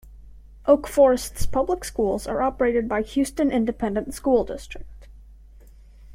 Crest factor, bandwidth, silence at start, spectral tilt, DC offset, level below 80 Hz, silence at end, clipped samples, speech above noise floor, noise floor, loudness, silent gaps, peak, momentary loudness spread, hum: 20 dB; 16.5 kHz; 0.05 s; -5.5 dB/octave; under 0.1%; -40 dBFS; 0 s; under 0.1%; 25 dB; -47 dBFS; -23 LUFS; none; -4 dBFS; 10 LU; none